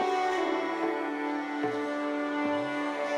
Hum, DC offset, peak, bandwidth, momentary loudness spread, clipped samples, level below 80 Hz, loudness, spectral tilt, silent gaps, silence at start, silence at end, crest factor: none; under 0.1%; -18 dBFS; 12 kHz; 4 LU; under 0.1%; -74 dBFS; -31 LUFS; -4.5 dB/octave; none; 0 s; 0 s; 14 dB